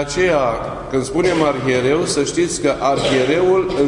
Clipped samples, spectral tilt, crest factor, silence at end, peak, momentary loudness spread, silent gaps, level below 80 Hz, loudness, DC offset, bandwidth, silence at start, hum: under 0.1%; -4.5 dB/octave; 14 dB; 0 s; -2 dBFS; 5 LU; none; -40 dBFS; -17 LUFS; under 0.1%; 11 kHz; 0 s; none